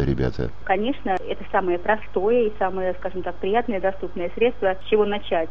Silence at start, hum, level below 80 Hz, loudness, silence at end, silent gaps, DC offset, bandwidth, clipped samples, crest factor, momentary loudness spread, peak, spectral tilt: 0 s; none; -40 dBFS; -24 LUFS; 0 s; none; 4%; 6.6 kHz; under 0.1%; 18 dB; 7 LU; -6 dBFS; -8 dB/octave